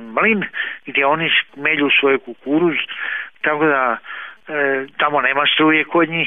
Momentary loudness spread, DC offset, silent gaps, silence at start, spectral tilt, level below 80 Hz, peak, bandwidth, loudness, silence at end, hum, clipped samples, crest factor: 10 LU; 0.3%; none; 0 s; -7.5 dB/octave; -64 dBFS; -2 dBFS; 3.9 kHz; -17 LUFS; 0 s; none; under 0.1%; 16 dB